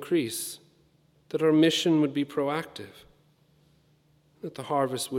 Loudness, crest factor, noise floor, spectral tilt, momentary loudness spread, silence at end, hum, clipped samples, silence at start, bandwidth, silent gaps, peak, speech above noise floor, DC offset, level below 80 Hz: -26 LUFS; 18 dB; -64 dBFS; -4.5 dB/octave; 21 LU; 0 s; none; under 0.1%; 0 s; 16.5 kHz; none; -10 dBFS; 38 dB; under 0.1%; -74 dBFS